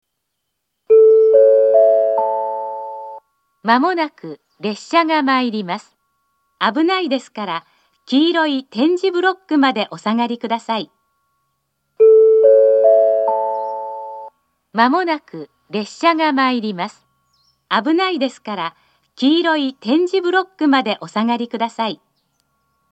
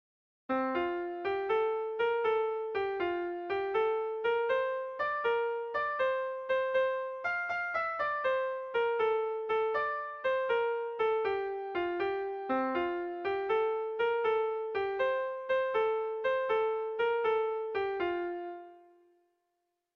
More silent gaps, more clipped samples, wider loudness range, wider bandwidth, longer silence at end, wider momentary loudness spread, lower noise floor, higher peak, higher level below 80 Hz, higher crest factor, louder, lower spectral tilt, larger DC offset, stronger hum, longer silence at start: neither; neither; first, 6 LU vs 1 LU; first, 8.2 kHz vs 6.2 kHz; second, 0.95 s vs 1.15 s; first, 16 LU vs 5 LU; second, -75 dBFS vs -83 dBFS; first, 0 dBFS vs -20 dBFS; second, -78 dBFS vs -70 dBFS; about the same, 16 dB vs 12 dB; first, -16 LUFS vs -32 LUFS; about the same, -5 dB/octave vs -5.5 dB/octave; neither; neither; first, 0.9 s vs 0.5 s